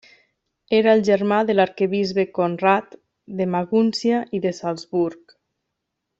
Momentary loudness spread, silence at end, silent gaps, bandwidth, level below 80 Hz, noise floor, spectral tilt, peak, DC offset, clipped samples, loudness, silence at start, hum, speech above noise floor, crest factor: 8 LU; 1.05 s; none; 8 kHz; -64 dBFS; -79 dBFS; -6.5 dB/octave; -4 dBFS; under 0.1%; under 0.1%; -20 LUFS; 0.7 s; none; 59 dB; 18 dB